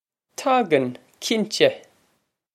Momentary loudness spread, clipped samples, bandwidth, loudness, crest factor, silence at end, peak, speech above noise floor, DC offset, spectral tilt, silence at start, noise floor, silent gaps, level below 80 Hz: 14 LU; under 0.1%; 15 kHz; -22 LUFS; 22 dB; 0.75 s; -2 dBFS; 49 dB; under 0.1%; -4 dB/octave; 0.4 s; -70 dBFS; none; -74 dBFS